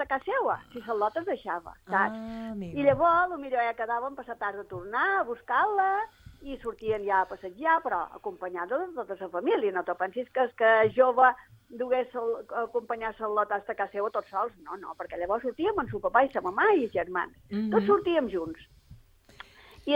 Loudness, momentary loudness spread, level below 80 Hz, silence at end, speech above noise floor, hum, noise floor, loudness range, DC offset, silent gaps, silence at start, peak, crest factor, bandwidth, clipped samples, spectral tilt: -28 LUFS; 14 LU; -60 dBFS; 0 s; 26 dB; none; -54 dBFS; 5 LU; under 0.1%; none; 0 s; -8 dBFS; 20 dB; 15.5 kHz; under 0.1%; -7 dB/octave